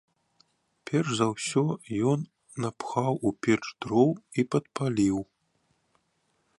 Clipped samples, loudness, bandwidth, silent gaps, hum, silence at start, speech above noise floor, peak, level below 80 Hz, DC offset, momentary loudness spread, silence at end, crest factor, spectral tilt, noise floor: under 0.1%; -28 LUFS; 11.5 kHz; none; none; 0.85 s; 46 dB; -10 dBFS; -62 dBFS; under 0.1%; 9 LU; 1.35 s; 20 dB; -6 dB/octave; -73 dBFS